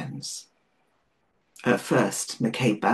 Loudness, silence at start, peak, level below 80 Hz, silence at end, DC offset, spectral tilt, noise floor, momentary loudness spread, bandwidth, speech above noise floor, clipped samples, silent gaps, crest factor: -26 LUFS; 0 s; -6 dBFS; -68 dBFS; 0 s; under 0.1%; -4.5 dB/octave; -71 dBFS; 12 LU; 12.5 kHz; 46 dB; under 0.1%; none; 22 dB